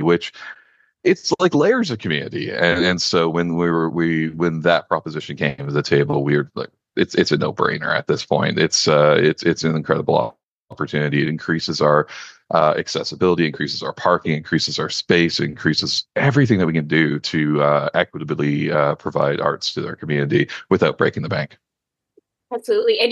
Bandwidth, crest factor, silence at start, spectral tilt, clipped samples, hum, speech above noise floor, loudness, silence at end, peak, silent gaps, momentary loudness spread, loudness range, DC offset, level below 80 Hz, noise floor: 9.8 kHz; 18 dB; 0 s; -5 dB/octave; under 0.1%; none; 64 dB; -19 LUFS; 0 s; -2 dBFS; 10.45-10.68 s; 8 LU; 3 LU; under 0.1%; -56 dBFS; -83 dBFS